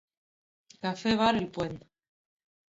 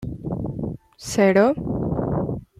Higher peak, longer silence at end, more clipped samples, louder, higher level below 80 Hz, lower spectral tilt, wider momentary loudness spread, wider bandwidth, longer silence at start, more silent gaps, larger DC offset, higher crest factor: second, -12 dBFS vs -4 dBFS; first, 0.95 s vs 0.15 s; neither; second, -29 LUFS vs -22 LUFS; second, -60 dBFS vs -42 dBFS; about the same, -5.5 dB/octave vs -6.5 dB/octave; second, 11 LU vs 14 LU; second, 7.8 kHz vs 14.5 kHz; first, 0.85 s vs 0 s; neither; neither; about the same, 20 dB vs 18 dB